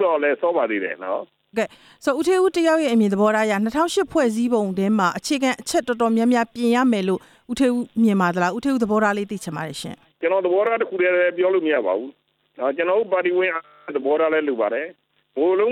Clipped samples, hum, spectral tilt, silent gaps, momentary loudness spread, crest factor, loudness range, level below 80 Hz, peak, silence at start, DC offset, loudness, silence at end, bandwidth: under 0.1%; none; -5.5 dB/octave; none; 10 LU; 14 dB; 2 LU; -60 dBFS; -6 dBFS; 0 s; under 0.1%; -21 LUFS; 0 s; 15.5 kHz